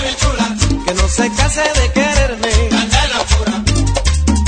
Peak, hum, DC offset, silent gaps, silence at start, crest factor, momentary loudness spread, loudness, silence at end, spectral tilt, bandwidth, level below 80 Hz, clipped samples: 0 dBFS; none; under 0.1%; none; 0 s; 14 dB; 2 LU; -14 LUFS; 0 s; -4 dB/octave; 9.4 kHz; -18 dBFS; under 0.1%